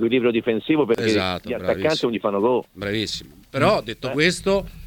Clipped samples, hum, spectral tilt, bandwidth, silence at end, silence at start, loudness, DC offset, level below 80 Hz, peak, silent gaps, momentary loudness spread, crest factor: under 0.1%; none; -5 dB/octave; 18.5 kHz; 0 s; 0 s; -21 LUFS; under 0.1%; -48 dBFS; -4 dBFS; none; 7 LU; 16 dB